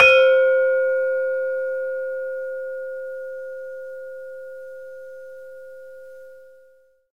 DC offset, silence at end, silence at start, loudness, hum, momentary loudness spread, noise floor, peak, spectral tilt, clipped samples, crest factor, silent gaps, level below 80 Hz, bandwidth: 0.3%; 0.7 s; 0 s; -21 LUFS; none; 24 LU; -56 dBFS; -2 dBFS; -1.5 dB/octave; under 0.1%; 22 dB; none; -66 dBFS; 8 kHz